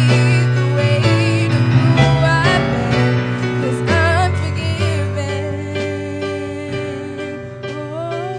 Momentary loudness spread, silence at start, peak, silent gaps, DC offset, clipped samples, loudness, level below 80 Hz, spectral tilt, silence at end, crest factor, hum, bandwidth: 12 LU; 0 s; 0 dBFS; none; under 0.1%; under 0.1%; -17 LUFS; -38 dBFS; -6.5 dB/octave; 0 s; 16 dB; none; 10 kHz